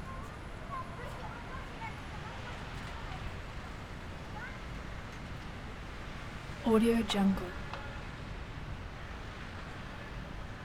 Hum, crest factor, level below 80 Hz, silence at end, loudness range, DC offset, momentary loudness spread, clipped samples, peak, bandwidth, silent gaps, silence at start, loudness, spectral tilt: none; 22 dB; -48 dBFS; 0 s; 10 LU; under 0.1%; 14 LU; under 0.1%; -16 dBFS; 16 kHz; none; 0 s; -38 LUFS; -6 dB/octave